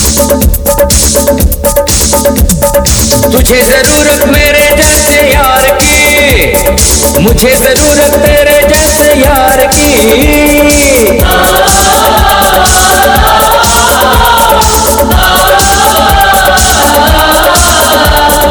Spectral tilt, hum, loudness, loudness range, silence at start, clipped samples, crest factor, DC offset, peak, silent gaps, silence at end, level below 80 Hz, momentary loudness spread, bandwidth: -3 dB/octave; none; -4 LUFS; 1 LU; 0 s; 5%; 4 dB; under 0.1%; 0 dBFS; none; 0 s; -14 dBFS; 2 LU; over 20 kHz